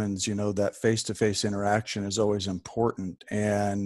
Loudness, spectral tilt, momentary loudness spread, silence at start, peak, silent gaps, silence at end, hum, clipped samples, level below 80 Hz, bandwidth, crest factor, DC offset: -28 LUFS; -5 dB/octave; 4 LU; 0 s; -10 dBFS; none; 0 s; none; under 0.1%; -58 dBFS; 12.5 kHz; 18 dB; under 0.1%